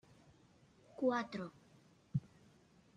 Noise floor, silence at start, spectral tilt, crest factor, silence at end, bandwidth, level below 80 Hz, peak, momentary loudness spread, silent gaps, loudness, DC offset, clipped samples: -68 dBFS; 1 s; -7.5 dB/octave; 20 dB; 0.7 s; 9.8 kHz; -78 dBFS; -24 dBFS; 14 LU; none; -41 LUFS; under 0.1%; under 0.1%